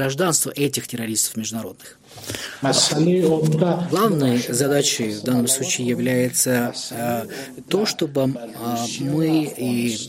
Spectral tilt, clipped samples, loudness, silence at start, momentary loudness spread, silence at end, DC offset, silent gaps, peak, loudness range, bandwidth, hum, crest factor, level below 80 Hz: -4 dB/octave; under 0.1%; -20 LUFS; 0 s; 10 LU; 0 s; under 0.1%; none; -2 dBFS; 4 LU; 16.5 kHz; none; 18 dB; -60 dBFS